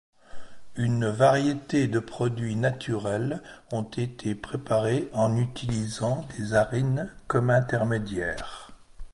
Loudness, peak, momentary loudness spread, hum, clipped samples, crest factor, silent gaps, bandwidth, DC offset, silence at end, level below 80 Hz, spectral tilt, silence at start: -27 LUFS; -8 dBFS; 10 LU; none; under 0.1%; 20 dB; none; 11.5 kHz; under 0.1%; 0.05 s; -50 dBFS; -6.5 dB/octave; 0.35 s